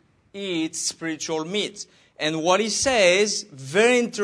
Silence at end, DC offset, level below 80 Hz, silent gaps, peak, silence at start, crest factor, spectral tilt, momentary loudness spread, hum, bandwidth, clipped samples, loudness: 0 s; under 0.1%; -58 dBFS; none; -4 dBFS; 0.35 s; 18 dB; -2.5 dB/octave; 14 LU; none; 11 kHz; under 0.1%; -22 LUFS